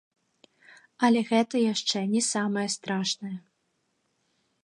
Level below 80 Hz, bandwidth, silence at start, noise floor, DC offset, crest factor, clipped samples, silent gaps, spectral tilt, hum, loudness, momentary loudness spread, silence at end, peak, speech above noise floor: -80 dBFS; 11 kHz; 1 s; -75 dBFS; under 0.1%; 20 dB; under 0.1%; none; -3.5 dB/octave; none; -26 LUFS; 8 LU; 1.25 s; -8 dBFS; 49 dB